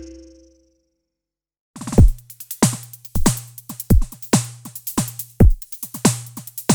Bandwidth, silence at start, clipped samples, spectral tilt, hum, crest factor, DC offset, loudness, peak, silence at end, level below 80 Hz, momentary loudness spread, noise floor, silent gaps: over 20 kHz; 0 s; under 0.1%; -5 dB/octave; 50 Hz at -45 dBFS; 20 dB; under 0.1%; -20 LUFS; 0 dBFS; 0 s; -24 dBFS; 16 LU; -86 dBFS; 1.59-1.74 s